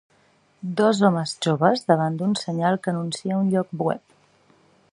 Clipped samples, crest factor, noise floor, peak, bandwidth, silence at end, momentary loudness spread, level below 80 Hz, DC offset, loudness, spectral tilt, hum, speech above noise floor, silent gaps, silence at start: under 0.1%; 20 dB; -61 dBFS; -2 dBFS; 11 kHz; 0.95 s; 8 LU; -68 dBFS; under 0.1%; -22 LUFS; -6 dB/octave; none; 39 dB; none; 0.65 s